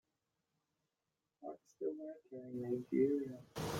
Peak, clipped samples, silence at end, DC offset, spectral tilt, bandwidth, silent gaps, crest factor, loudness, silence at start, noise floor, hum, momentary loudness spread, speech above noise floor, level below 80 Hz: -22 dBFS; under 0.1%; 0 s; under 0.1%; -6.5 dB/octave; 16.5 kHz; none; 20 dB; -41 LUFS; 1.4 s; -90 dBFS; none; 17 LU; 50 dB; -74 dBFS